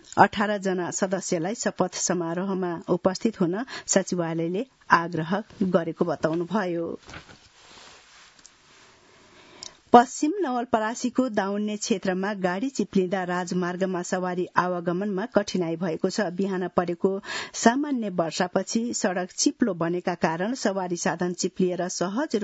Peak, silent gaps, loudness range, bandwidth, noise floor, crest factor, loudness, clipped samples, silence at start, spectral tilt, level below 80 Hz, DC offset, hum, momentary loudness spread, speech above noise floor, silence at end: 0 dBFS; none; 3 LU; 8 kHz; -55 dBFS; 26 dB; -26 LUFS; under 0.1%; 0.15 s; -4.5 dB/octave; -64 dBFS; under 0.1%; none; 6 LU; 30 dB; 0 s